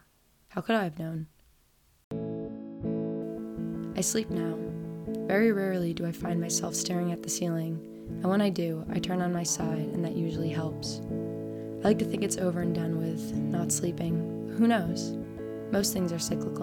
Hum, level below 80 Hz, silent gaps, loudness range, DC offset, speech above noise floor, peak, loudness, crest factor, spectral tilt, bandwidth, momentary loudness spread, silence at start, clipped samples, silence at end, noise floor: none; -58 dBFS; 2.04-2.11 s; 5 LU; under 0.1%; 36 dB; -12 dBFS; -30 LUFS; 18 dB; -5 dB/octave; 18 kHz; 10 LU; 0.5 s; under 0.1%; 0 s; -65 dBFS